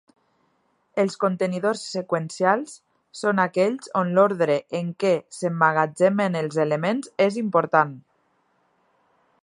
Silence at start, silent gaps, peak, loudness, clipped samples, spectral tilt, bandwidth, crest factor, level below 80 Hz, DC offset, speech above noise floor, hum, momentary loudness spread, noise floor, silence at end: 0.95 s; none; -2 dBFS; -23 LUFS; under 0.1%; -6 dB/octave; 11.5 kHz; 22 dB; -74 dBFS; under 0.1%; 46 dB; none; 8 LU; -68 dBFS; 1.4 s